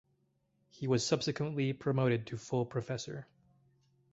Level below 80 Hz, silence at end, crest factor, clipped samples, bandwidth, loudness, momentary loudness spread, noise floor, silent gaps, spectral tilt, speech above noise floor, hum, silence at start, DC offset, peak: -70 dBFS; 0.9 s; 20 dB; under 0.1%; 8 kHz; -34 LUFS; 10 LU; -76 dBFS; none; -5.5 dB/octave; 42 dB; none; 0.8 s; under 0.1%; -16 dBFS